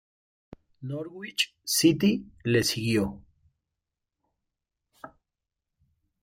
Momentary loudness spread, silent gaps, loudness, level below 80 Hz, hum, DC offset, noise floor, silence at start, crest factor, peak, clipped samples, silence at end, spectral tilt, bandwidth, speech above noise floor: 14 LU; none; -26 LUFS; -60 dBFS; none; under 0.1%; -87 dBFS; 0.8 s; 22 dB; -8 dBFS; under 0.1%; 1.15 s; -4 dB/octave; 16.5 kHz; 60 dB